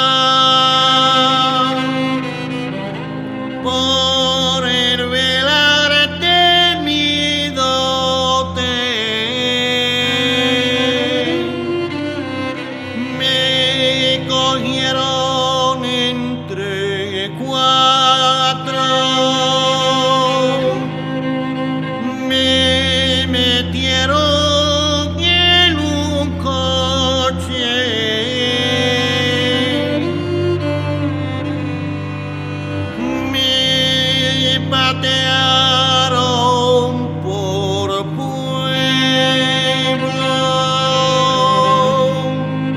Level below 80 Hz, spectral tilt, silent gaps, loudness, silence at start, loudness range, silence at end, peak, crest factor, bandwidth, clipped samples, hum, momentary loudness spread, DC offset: -42 dBFS; -4 dB/octave; none; -14 LUFS; 0 s; 4 LU; 0 s; -2 dBFS; 14 dB; 15.5 kHz; under 0.1%; none; 11 LU; under 0.1%